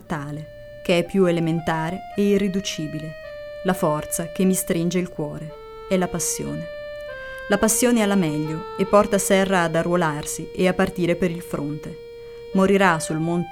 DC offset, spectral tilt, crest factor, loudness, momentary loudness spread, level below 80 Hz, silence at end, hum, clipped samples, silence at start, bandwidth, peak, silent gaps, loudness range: under 0.1%; -5 dB/octave; 18 dB; -22 LUFS; 16 LU; -46 dBFS; 0 s; none; under 0.1%; 0 s; 17.5 kHz; -4 dBFS; none; 5 LU